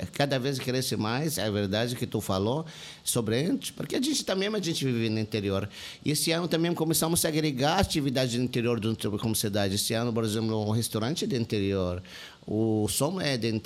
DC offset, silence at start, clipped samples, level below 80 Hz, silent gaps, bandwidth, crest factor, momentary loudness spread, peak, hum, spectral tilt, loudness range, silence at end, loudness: under 0.1%; 0 s; under 0.1%; -54 dBFS; none; 16 kHz; 16 dB; 6 LU; -12 dBFS; none; -4.5 dB/octave; 2 LU; 0 s; -28 LUFS